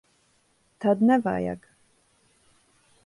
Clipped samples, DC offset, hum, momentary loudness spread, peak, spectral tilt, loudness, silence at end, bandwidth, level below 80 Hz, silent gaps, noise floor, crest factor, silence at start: under 0.1%; under 0.1%; none; 13 LU; -8 dBFS; -8 dB/octave; -24 LUFS; 1.5 s; 11.5 kHz; -62 dBFS; none; -66 dBFS; 20 dB; 0.8 s